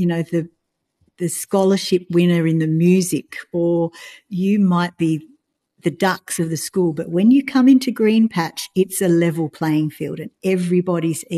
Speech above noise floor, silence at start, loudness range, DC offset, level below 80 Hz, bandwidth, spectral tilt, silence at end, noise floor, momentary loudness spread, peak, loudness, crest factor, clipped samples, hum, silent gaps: 49 dB; 0 s; 4 LU; under 0.1%; -64 dBFS; 13 kHz; -6 dB/octave; 0 s; -67 dBFS; 11 LU; -4 dBFS; -18 LUFS; 14 dB; under 0.1%; none; none